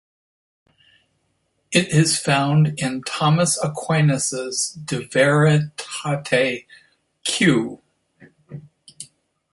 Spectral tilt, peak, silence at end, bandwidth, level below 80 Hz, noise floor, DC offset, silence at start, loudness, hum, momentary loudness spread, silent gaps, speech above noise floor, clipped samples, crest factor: -4.5 dB/octave; -2 dBFS; 0.5 s; 12 kHz; -60 dBFS; -69 dBFS; under 0.1%; 1.7 s; -19 LUFS; none; 22 LU; none; 50 dB; under 0.1%; 18 dB